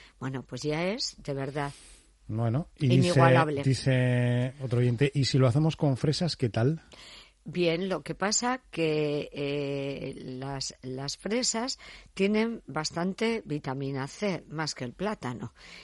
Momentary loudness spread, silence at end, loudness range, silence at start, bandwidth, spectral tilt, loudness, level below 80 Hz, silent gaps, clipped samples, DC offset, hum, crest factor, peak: 13 LU; 0 s; 6 LU; 0 s; 11.5 kHz; -5.5 dB/octave; -29 LUFS; -58 dBFS; none; under 0.1%; under 0.1%; none; 20 dB; -8 dBFS